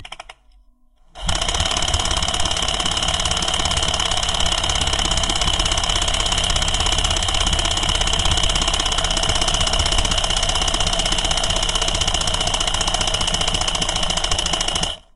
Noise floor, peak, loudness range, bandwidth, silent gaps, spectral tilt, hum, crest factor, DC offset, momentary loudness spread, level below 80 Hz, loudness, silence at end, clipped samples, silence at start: -52 dBFS; -2 dBFS; 1 LU; 11.5 kHz; none; -1.5 dB/octave; none; 18 dB; 0.7%; 2 LU; -26 dBFS; -18 LUFS; 0 s; under 0.1%; 0 s